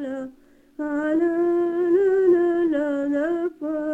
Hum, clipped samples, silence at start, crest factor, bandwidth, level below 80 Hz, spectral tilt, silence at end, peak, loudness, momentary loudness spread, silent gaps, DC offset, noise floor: none; under 0.1%; 0 s; 12 dB; 7.4 kHz; -60 dBFS; -7 dB/octave; 0 s; -8 dBFS; -22 LUFS; 13 LU; none; under 0.1%; -52 dBFS